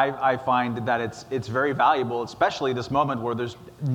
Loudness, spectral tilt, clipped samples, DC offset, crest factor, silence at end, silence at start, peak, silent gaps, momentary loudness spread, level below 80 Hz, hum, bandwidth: -25 LUFS; -6 dB/octave; under 0.1%; under 0.1%; 16 dB; 0 s; 0 s; -8 dBFS; none; 9 LU; -58 dBFS; none; 17.5 kHz